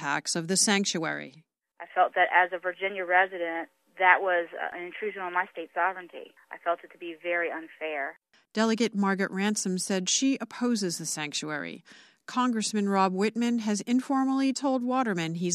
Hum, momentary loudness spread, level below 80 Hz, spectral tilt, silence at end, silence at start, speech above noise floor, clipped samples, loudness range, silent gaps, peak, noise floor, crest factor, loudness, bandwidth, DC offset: none; 13 LU; -80 dBFS; -3.5 dB/octave; 0 s; 0 s; 21 dB; under 0.1%; 6 LU; none; -4 dBFS; -49 dBFS; 24 dB; -27 LUFS; 14 kHz; under 0.1%